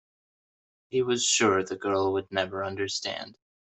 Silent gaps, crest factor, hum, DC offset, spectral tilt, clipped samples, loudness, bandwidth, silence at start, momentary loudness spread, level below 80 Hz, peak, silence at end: none; 18 dB; none; under 0.1%; -2.5 dB/octave; under 0.1%; -27 LUFS; 8.4 kHz; 0.9 s; 11 LU; -72 dBFS; -10 dBFS; 0.4 s